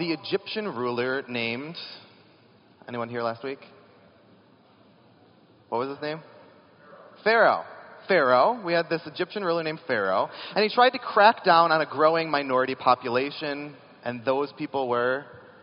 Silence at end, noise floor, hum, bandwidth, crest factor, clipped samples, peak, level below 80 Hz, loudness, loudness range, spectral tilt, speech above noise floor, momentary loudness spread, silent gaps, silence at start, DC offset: 0.25 s; -57 dBFS; none; 5.6 kHz; 22 dB; under 0.1%; -4 dBFS; -78 dBFS; -25 LUFS; 16 LU; -2 dB/octave; 32 dB; 16 LU; none; 0 s; under 0.1%